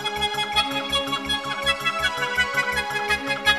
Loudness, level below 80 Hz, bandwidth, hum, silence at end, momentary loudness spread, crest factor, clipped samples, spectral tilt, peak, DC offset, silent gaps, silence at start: -22 LUFS; -46 dBFS; 15.5 kHz; none; 0 s; 3 LU; 18 dB; under 0.1%; -2 dB/octave; -6 dBFS; 0.1%; none; 0 s